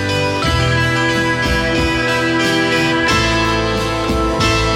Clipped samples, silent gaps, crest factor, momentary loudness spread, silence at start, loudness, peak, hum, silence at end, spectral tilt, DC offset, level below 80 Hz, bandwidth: under 0.1%; none; 12 dB; 3 LU; 0 s; -15 LUFS; -4 dBFS; none; 0 s; -4.5 dB/octave; under 0.1%; -28 dBFS; 16.5 kHz